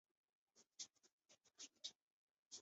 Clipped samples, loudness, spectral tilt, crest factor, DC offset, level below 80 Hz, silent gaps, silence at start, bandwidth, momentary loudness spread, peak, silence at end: under 0.1%; -57 LUFS; 1.5 dB/octave; 26 dB; under 0.1%; under -90 dBFS; 1.12-1.19 s, 2.02-2.51 s; 0.55 s; 8 kHz; 6 LU; -38 dBFS; 0 s